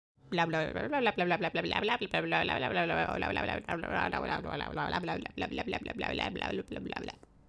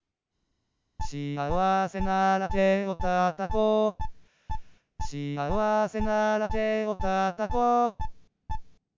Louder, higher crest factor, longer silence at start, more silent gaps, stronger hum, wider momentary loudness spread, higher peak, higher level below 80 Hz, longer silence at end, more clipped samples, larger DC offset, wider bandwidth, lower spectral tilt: second, -33 LUFS vs -27 LUFS; first, 20 dB vs 14 dB; second, 0.25 s vs 1 s; neither; neither; second, 7 LU vs 16 LU; about the same, -14 dBFS vs -12 dBFS; second, -54 dBFS vs -42 dBFS; about the same, 0.35 s vs 0.25 s; neither; neither; first, 11 kHz vs 7.6 kHz; about the same, -6 dB/octave vs -6.5 dB/octave